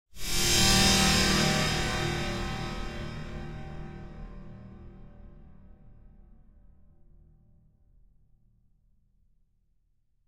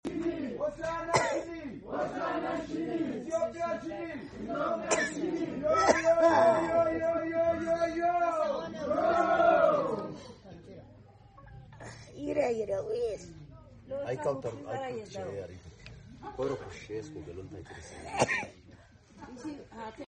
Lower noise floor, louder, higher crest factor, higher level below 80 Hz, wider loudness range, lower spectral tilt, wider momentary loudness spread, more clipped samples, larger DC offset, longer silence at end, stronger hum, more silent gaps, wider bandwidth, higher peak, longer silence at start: first, -69 dBFS vs -56 dBFS; first, -25 LUFS vs -31 LUFS; about the same, 24 dB vs 22 dB; first, -40 dBFS vs -58 dBFS; first, 25 LU vs 11 LU; second, -3 dB/octave vs -4.5 dB/octave; first, 26 LU vs 22 LU; neither; neither; first, 4.2 s vs 0 s; neither; neither; first, 16 kHz vs 10 kHz; about the same, -8 dBFS vs -8 dBFS; about the same, 0.15 s vs 0.05 s